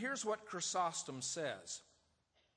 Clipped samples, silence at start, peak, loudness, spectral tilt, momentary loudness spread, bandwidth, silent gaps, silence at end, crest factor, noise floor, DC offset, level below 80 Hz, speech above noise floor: under 0.1%; 0 s; -26 dBFS; -41 LUFS; -2 dB/octave; 10 LU; 10.5 kHz; none; 0.75 s; 18 dB; -78 dBFS; under 0.1%; -84 dBFS; 36 dB